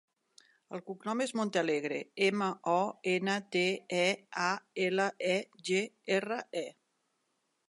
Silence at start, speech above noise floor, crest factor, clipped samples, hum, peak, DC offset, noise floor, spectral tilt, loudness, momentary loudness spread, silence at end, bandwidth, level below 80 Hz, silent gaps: 0.7 s; 47 dB; 18 dB; under 0.1%; none; -16 dBFS; under 0.1%; -80 dBFS; -4 dB/octave; -32 LUFS; 9 LU; 0.95 s; 11.5 kHz; -86 dBFS; none